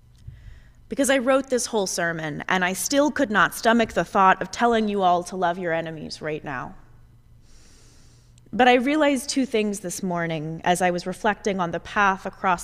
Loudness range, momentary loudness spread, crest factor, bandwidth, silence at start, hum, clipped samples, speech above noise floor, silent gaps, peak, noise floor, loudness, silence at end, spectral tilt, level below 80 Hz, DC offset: 6 LU; 11 LU; 20 dB; 16 kHz; 0.25 s; none; under 0.1%; 29 dB; none; -4 dBFS; -51 dBFS; -22 LUFS; 0 s; -4 dB/octave; -52 dBFS; under 0.1%